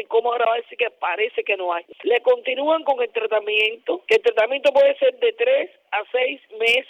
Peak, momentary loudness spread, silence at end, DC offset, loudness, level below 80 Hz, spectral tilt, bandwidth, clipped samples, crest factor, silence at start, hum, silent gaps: -8 dBFS; 7 LU; 0.05 s; under 0.1%; -20 LUFS; -74 dBFS; -2 dB/octave; 11.5 kHz; under 0.1%; 12 dB; 0 s; none; none